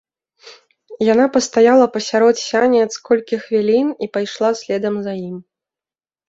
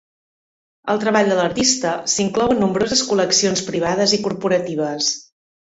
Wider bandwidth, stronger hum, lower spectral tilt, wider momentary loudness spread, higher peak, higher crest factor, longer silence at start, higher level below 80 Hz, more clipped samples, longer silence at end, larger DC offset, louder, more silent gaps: about the same, 8 kHz vs 8.2 kHz; neither; first, -4.5 dB/octave vs -3 dB/octave; first, 10 LU vs 5 LU; about the same, -2 dBFS vs -2 dBFS; about the same, 16 dB vs 18 dB; second, 0.45 s vs 0.85 s; second, -62 dBFS vs -52 dBFS; neither; first, 0.85 s vs 0.55 s; neither; about the same, -16 LUFS vs -18 LUFS; neither